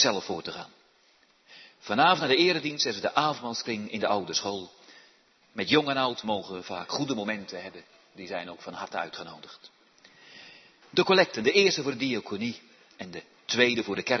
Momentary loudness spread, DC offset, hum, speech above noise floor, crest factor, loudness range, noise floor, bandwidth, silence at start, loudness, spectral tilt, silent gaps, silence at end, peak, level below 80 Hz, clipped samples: 22 LU; under 0.1%; none; 36 dB; 22 dB; 9 LU; -64 dBFS; 6.4 kHz; 0 s; -27 LUFS; -3.5 dB/octave; none; 0 s; -6 dBFS; -74 dBFS; under 0.1%